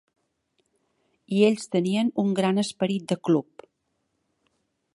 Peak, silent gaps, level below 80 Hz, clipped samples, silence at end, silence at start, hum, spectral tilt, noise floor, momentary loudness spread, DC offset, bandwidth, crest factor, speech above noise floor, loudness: -6 dBFS; none; -74 dBFS; under 0.1%; 1.55 s; 1.3 s; none; -6 dB/octave; -76 dBFS; 6 LU; under 0.1%; 11.5 kHz; 20 dB; 52 dB; -24 LUFS